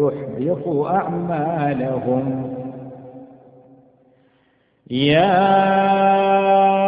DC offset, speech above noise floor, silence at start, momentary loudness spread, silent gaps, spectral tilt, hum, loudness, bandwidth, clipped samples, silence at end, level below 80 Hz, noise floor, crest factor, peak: under 0.1%; 43 dB; 0 s; 15 LU; none; -11.5 dB/octave; none; -18 LUFS; 5 kHz; under 0.1%; 0 s; -56 dBFS; -61 dBFS; 18 dB; -2 dBFS